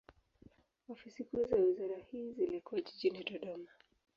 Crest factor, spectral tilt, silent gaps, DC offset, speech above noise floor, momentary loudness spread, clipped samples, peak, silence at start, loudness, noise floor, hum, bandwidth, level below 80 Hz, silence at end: 18 dB; -7 dB/octave; none; under 0.1%; 28 dB; 20 LU; under 0.1%; -22 dBFS; 0.9 s; -38 LUFS; -65 dBFS; none; 6.8 kHz; -70 dBFS; 0.5 s